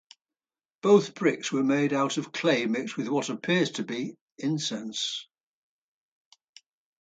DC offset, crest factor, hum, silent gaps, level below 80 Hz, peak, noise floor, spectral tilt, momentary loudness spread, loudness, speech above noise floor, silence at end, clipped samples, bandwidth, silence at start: under 0.1%; 22 dB; none; 4.21-4.36 s; -78 dBFS; -8 dBFS; under -90 dBFS; -4.5 dB/octave; 11 LU; -27 LUFS; over 64 dB; 1.75 s; under 0.1%; 9.2 kHz; 0.85 s